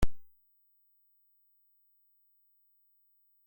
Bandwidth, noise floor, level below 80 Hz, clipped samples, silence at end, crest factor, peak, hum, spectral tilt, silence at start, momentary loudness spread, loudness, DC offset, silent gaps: 16.5 kHz; -70 dBFS; -46 dBFS; under 0.1%; 0 s; 22 dB; -14 dBFS; 50 Hz at -115 dBFS; -6 dB/octave; 0 s; 0 LU; -41 LUFS; under 0.1%; none